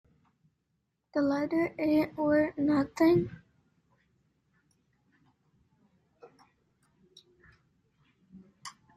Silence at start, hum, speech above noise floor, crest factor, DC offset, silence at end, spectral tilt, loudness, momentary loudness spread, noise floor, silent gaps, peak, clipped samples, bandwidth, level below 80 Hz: 1.15 s; none; 52 dB; 18 dB; under 0.1%; 0.25 s; -7 dB/octave; -28 LUFS; 17 LU; -80 dBFS; none; -14 dBFS; under 0.1%; 13.5 kHz; -66 dBFS